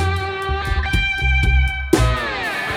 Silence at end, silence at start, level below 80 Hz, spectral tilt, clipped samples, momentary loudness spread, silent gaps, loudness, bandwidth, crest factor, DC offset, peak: 0 s; 0 s; -22 dBFS; -5 dB/octave; under 0.1%; 6 LU; none; -19 LUFS; 15 kHz; 18 dB; under 0.1%; 0 dBFS